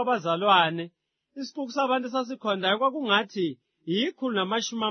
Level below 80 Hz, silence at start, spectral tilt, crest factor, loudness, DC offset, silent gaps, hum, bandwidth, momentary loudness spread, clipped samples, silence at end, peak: -82 dBFS; 0 s; -4 dB/octave; 20 dB; -26 LUFS; under 0.1%; none; none; 6.6 kHz; 14 LU; under 0.1%; 0 s; -6 dBFS